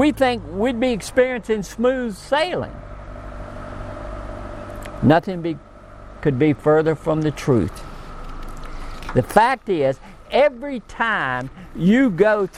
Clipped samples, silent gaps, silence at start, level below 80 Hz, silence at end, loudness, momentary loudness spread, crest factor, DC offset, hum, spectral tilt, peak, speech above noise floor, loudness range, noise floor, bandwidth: under 0.1%; none; 0 s; -38 dBFS; 0 s; -20 LUFS; 20 LU; 20 dB; under 0.1%; none; -6.5 dB/octave; 0 dBFS; 21 dB; 5 LU; -40 dBFS; 16 kHz